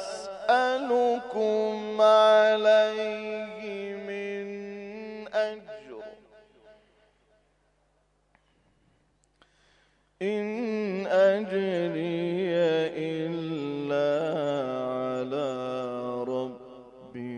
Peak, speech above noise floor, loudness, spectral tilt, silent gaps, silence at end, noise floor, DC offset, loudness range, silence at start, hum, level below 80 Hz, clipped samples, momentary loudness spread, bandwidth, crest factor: -10 dBFS; 46 dB; -27 LUFS; -5.5 dB/octave; none; 0 s; -69 dBFS; under 0.1%; 14 LU; 0 s; 50 Hz at -70 dBFS; -72 dBFS; under 0.1%; 18 LU; 10.5 kHz; 18 dB